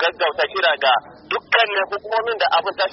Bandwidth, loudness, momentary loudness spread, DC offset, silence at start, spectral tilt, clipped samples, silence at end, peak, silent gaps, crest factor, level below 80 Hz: 6 kHz; -19 LUFS; 6 LU; under 0.1%; 0 s; 2.5 dB/octave; under 0.1%; 0 s; -2 dBFS; none; 18 dB; -64 dBFS